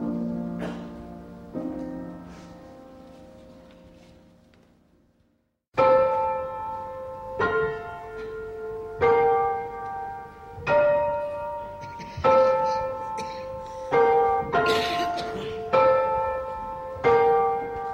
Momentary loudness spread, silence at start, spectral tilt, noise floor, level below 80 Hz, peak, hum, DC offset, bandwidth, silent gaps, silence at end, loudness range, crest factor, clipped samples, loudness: 18 LU; 0 s; -5.5 dB/octave; -70 dBFS; -52 dBFS; -8 dBFS; none; under 0.1%; 14 kHz; 5.68-5.72 s; 0 s; 15 LU; 18 dB; under 0.1%; -25 LUFS